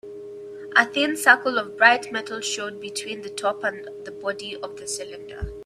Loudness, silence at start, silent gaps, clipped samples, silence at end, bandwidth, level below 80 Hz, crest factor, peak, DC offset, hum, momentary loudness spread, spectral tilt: -22 LUFS; 0.05 s; none; under 0.1%; 0 s; 15.5 kHz; -50 dBFS; 24 dB; 0 dBFS; under 0.1%; none; 20 LU; -2 dB/octave